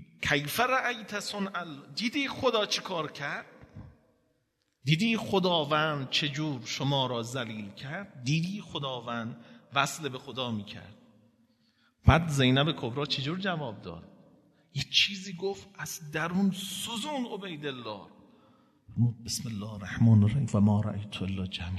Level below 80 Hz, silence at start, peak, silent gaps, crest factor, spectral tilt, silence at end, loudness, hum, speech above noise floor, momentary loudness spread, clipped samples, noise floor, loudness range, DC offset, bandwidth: -52 dBFS; 0 s; -6 dBFS; none; 24 dB; -5 dB/octave; 0 s; -30 LUFS; none; 46 dB; 15 LU; under 0.1%; -76 dBFS; 5 LU; under 0.1%; 13.5 kHz